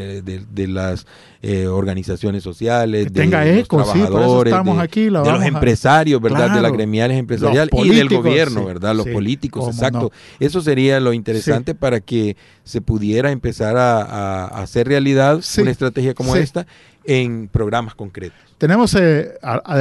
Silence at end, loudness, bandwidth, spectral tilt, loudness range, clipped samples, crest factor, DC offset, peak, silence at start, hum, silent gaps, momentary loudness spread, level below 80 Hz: 0 s; -16 LUFS; 12 kHz; -6.5 dB/octave; 5 LU; under 0.1%; 14 dB; under 0.1%; -2 dBFS; 0 s; none; none; 11 LU; -38 dBFS